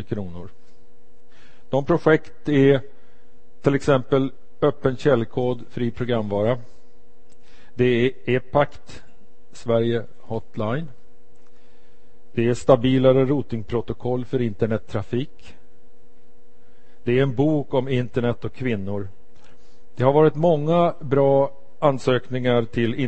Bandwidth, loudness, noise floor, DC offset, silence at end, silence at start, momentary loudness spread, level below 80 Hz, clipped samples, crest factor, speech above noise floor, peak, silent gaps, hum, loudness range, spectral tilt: 8.6 kHz; -22 LUFS; -57 dBFS; 3%; 0 s; 0 s; 12 LU; -50 dBFS; under 0.1%; 22 dB; 36 dB; 0 dBFS; none; none; 6 LU; -8 dB/octave